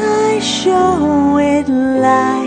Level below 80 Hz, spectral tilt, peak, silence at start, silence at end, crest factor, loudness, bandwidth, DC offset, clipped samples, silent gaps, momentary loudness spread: -42 dBFS; -4.5 dB/octave; 0 dBFS; 0 s; 0 s; 12 dB; -13 LUFS; 9.4 kHz; under 0.1%; under 0.1%; none; 2 LU